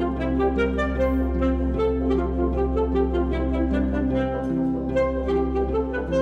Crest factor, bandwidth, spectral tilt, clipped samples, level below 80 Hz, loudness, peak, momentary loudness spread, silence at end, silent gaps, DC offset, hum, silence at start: 12 dB; 6.6 kHz; -9 dB/octave; under 0.1%; -28 dBFS; -24 LUFS; -10 dBFS; 2 LU; 0 s; none; under 0.1%; none; 0 s